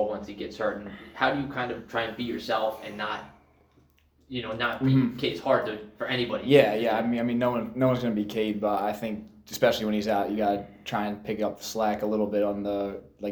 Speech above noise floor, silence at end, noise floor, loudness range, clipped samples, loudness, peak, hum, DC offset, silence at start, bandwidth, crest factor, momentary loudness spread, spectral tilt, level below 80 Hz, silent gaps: 35 dB; 0 s; -62 dBFS; 6 LU; under 0.1%; -27 LUFS; -4 dBFS; none; under 0.1%; 0 s; over 20 kHz; 22 dB; 11 LU; -6 dB/octave; -58 dBFS; none